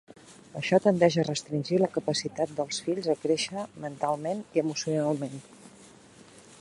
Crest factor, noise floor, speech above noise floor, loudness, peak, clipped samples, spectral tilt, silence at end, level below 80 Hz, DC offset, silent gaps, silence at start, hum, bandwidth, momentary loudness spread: 22 dB; -53 dBFS; 25 dB; -28 LUFS; -8 dBFS; under 0.1%; -5 dB/octave; 0.05 s; -70 dBFS; under 0.1%; none; 0.3 s; none; 11.5 kHz; 11 LU